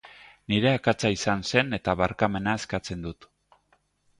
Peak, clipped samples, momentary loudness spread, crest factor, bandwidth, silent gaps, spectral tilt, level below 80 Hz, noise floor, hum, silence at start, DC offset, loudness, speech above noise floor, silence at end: -6 dBFS; under 0.1%; 12 LU; 22 dB; 11.5 kHz; none; -5 dB/octave; -50 dBFS; -68 dBFS; 50 Hz at -50 dBFS; 0.05 s; under 0.1%; -26 LUFS; 42 dB; 1.05 s